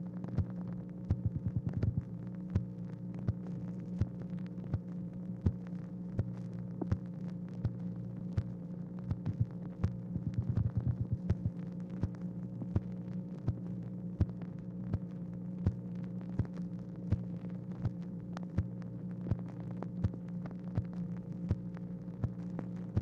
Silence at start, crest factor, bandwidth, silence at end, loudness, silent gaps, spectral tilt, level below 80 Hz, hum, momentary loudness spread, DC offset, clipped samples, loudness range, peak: 0 s; 22 dB; 6.6 kHz; 0 s; -39 LUFS; none; -10.5 dB/octave; -50 dBFS; none; 7 LU; under 0.1%; under 0.1%; 3 LU; -16 dBFS